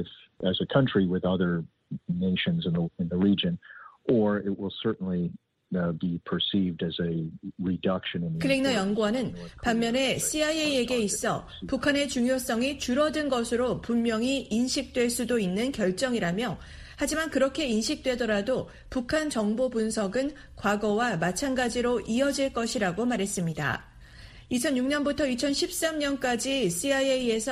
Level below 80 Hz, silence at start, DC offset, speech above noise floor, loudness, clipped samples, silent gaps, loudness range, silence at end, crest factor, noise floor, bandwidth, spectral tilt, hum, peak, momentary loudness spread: -52 dBFS; 0 s; under 0.1%; 21 dB; -27 LUFS; under 0.1%; none; 2 LU; 0 s; 20 dB; -48 dBFS; 15 kHz; -4.5 dB/octave; none; -8 dBFS; 7 LU